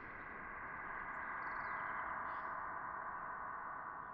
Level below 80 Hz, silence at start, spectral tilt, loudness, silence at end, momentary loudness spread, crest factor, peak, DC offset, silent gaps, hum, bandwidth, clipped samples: -68 dBFS; 0 s; -3.5 dB/octave; -45 LUFS; 0 s; 5 LU; 14 dB; -32 dBFS; under 0.1%; none; none; 5.6 kHz; under 0.1%